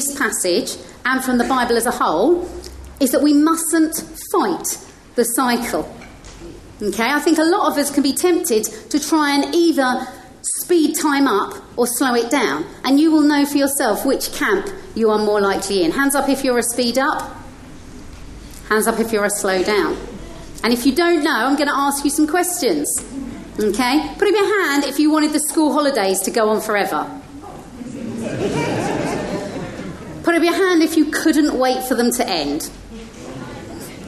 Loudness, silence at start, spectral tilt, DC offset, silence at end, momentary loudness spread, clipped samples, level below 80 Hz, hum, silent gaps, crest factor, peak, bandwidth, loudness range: -17 LUFS; 0 s; -3 dB/octave; under 0.1%; 0 s; 17 LU; under 0.1%; -44 dBFS; none; none; 16 dB; -2 dBFS; 13 kHz; 4 LU